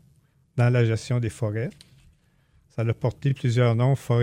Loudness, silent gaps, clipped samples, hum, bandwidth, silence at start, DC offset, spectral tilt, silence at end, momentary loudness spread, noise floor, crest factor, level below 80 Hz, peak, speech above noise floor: -24 LUFS; none; under 0.1%; none; 11 kHz; 0.55 s; under 0.1%; -7.5 dB/octave; 0 s; 11 LU; -62 dBFS; 16 dB; -58 dBFS; -10 dBFS; 39 dB